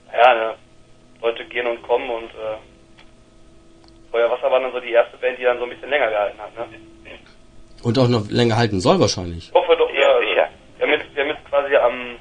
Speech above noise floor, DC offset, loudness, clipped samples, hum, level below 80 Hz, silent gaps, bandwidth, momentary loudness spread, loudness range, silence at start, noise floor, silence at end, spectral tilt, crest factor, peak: 29 dB; under 0.1%; -19 LUFS; under 0.1%; none; -50 dBFS; none; 10 kHz; 12 LU; 8 LU; 0.1 s; -48 dBFS; 0.05 s; -5.5 dB/octave; 20 dB; 0 dBFS